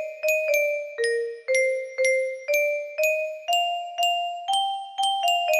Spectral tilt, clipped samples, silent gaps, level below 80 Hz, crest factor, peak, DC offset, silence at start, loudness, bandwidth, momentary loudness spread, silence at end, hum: 2.5 dB/octave; under 0.1%; none; -78 dBFS; 14 dB; -10 dBFS; under 0.1%; 0 s; -24 LUFS; 15.5 kHz; 4 LU; 0 s; none